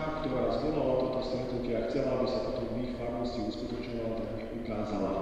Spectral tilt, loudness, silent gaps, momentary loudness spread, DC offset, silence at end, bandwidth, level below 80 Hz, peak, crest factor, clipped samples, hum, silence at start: -7.5 dB/octave; -33 LUFS; none; 7 LU; under 0.1%; 0 s; 10.5 kHz; -46 dBFS; -18 dBFS; 14 dB; under 0.1%; none; 0 s